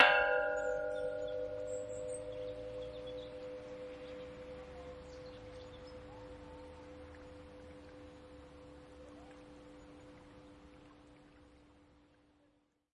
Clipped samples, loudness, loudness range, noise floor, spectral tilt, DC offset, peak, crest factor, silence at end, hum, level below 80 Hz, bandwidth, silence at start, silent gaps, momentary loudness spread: under 0.1%; -40 LUFS; 16 LU; -75 dBFS; -3.5 dB/octave; under 0.1%; -10 dBFS; 32 dB; 1.1 s; none; -64 dBFS; 11 kHz; 0 s; none; 20 LU